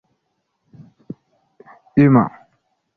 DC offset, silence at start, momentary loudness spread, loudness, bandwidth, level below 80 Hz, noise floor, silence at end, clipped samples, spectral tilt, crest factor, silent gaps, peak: under 0.1%; 1.95 s; 26 LU; -16 LUFS; 4.6 kHz; -56 dBFS; -72 dBFS; 0.7 s; under 0.1%; -11.5 dB/octave; 18 dB; none; -2 dBFS